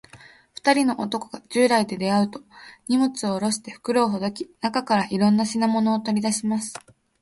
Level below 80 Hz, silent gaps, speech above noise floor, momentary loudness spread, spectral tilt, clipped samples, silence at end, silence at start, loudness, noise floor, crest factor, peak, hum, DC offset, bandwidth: -64 dBFS; none; 27 dB; 10 LU; -4.5 dB/octave; under 0.1%; 0.45 s; 0.15 s; -23 LUFS; -50 dBFS; 20 dB; -4 dBFS; none; under 0.1%; 11.5 kHz